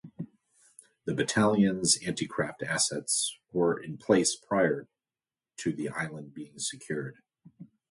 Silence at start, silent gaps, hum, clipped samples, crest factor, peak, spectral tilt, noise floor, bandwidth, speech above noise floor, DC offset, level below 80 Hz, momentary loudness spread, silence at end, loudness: 0.05 s; none; none; under 0.1%; 22 dB; -10 dBFS; -3.5 dB/octave; under -90 dBFS; 11.5 kHz; over 61 dB; under 0.1%; -66 dBFS; 17 LU; 0.25 s; -29 LUFS